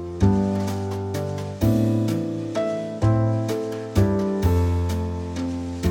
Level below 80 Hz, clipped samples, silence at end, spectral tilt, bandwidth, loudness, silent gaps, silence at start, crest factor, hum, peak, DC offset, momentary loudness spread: -36 dBFS; under 0.1%; 0 s; -8 dB/octave; 17 kHz; -23 LUFS; none; 0 s; 16 dB; none; -6 dBFS; under 0.1%; 8 LU